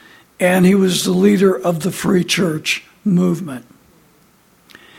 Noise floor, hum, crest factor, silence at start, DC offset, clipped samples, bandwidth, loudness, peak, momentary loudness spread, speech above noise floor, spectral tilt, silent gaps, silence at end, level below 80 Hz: -53 dBFS; none; 16 dB; 0.4 s; under 0.1%; under 0.1%; 16.5 kHz; -16 LUFS; -2 dBFS; 8 LU; 38 dB; -5.5 dB/octave; none; 1.4 s; -54 dBFS